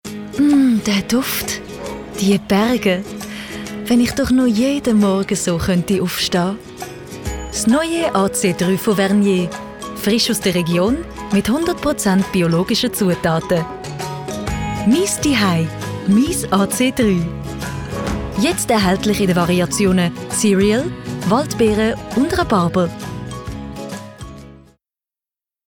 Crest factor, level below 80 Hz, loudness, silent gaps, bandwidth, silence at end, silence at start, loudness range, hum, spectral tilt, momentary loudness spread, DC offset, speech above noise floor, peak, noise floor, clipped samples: 14 dB; -38 dBFS; -17 LUFS; none; 19.5 kHz; 1.1 s; 0.05 s; 2 LU; none; -5 dB/octave; 13 LU; under 0.1%; over 74 dB; -4 dBFS; under -90 dBFS; under 0.1%